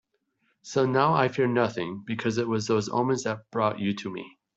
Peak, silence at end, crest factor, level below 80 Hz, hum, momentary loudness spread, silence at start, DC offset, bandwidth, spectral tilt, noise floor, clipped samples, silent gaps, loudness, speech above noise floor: -8 dBFS; 0.3 s; 20 dB; -68 dBFS; none; 10 LU; 0.65 s; under 0.1%; 8 kHz; -6 dB/octave; -73 dBFS; under 0.1%; none; -26 LUFS; 47 dB